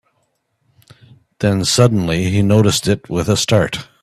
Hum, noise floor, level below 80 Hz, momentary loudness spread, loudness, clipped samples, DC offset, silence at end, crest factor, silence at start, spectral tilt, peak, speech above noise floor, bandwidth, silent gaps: none; -66 dBFS; -44 dBFS; 6 LU; -15 LUFS; under 0.1%; under 0.1%; 0.2 s; 16 dB; 1.4 s; -5 dB/octave; 0 dBFS; 51 dB; 14 kHz; none